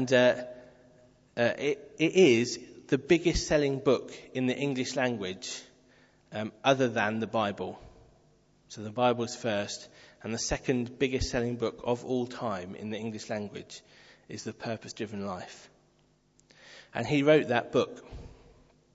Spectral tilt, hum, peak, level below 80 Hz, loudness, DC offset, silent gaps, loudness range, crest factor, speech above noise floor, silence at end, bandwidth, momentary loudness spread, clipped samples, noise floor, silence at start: -5 dB/octave; none; -8 dBFS; -52 dBFS; -29 LUFS; under 0.1%; none; 11 LU; 22 dB; 38 dB; 0.65 s; 8 kHz; 18 LU; under 0.1%; -67 dBFS; 0 s